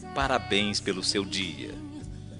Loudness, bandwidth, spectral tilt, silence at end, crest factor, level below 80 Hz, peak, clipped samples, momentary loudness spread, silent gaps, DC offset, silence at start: -27 LUFS; 10.5 kHz; -3.5 dB/octave; 0 s; 22 dB; -48 dBFS; -8 dBFS; under 0.1%; 15 LU; none; under 0.1%; 0 s